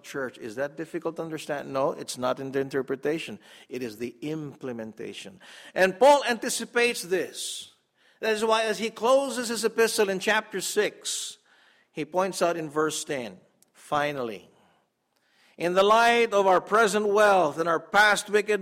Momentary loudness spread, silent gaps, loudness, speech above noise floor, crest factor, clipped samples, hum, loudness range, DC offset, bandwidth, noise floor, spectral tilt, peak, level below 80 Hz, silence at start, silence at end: 16 LU; none; -25 LUFS; 46 dB; 18 dB; under 0.1%; none; 9 LU; under 0.1%; 16 kHz; -72 dBFS; -3 dB/octave; -8 dBFS; -70 dBFS; 0.05 s; 0 s